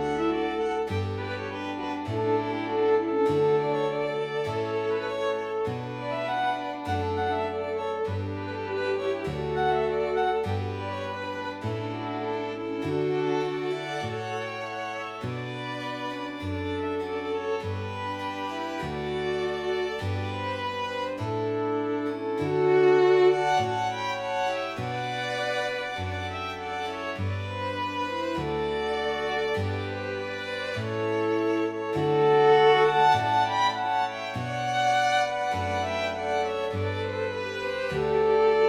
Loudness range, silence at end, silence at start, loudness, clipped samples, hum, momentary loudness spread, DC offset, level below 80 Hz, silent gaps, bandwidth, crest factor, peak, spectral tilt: 8 LU; 0 s; 0 s; -27 LUFS; under 0.1%; none; 10 LU; under 0.1%; -56 dBFS; none; 12 kHz; 18 dB; -8 dBFS; -6 dB/octave